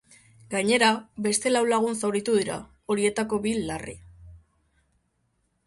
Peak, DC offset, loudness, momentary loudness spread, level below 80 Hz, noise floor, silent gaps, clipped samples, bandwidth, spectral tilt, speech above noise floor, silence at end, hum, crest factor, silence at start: -6 dBFS; under 0.1%; -25 LUFS; 13 LU; -56 dBFS; -72 dBFS; none; under 0.1%; 11.5 kHz; -3.5 dB/octave; 47 dB; 1.3 s; none; 22 dB; 0.5 s